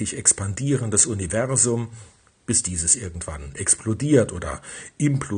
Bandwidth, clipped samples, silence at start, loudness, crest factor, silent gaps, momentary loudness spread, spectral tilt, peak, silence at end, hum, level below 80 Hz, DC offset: 10.5 kHz; under 0.1%; 0 s; -21 LUFS; 22 dB; none; 14 LU; -4 dB/octave; 0 dBFS; 0 s; none; -46 dBFS; under 0.1%